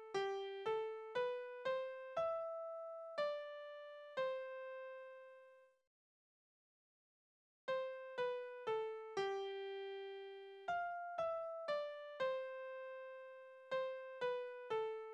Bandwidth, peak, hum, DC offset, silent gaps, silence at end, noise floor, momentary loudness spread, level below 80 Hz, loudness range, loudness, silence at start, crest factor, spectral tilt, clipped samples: 9 kHz; -30 dBFS; none; under 0.1%; 5.87-7.68 s; 0 s; -66 dBFS; 11 LU; -88 dBFS; 7 LU; -45 LUFS; 0 s; 16 dB; -4 dB/octave; under 0.1%